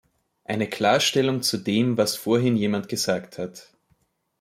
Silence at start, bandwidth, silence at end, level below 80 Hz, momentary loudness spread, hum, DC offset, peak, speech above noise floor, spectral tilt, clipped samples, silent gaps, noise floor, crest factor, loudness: 0.5 s; 16.5 kHz; 0.8 s; -66 dBFS; 14 LU; none; under 0.1%; -6 dBFS; 45 dB; -4.5 dB/octave; under 0.1%; none; -68 dBFS; 18 dB; -23 LUFS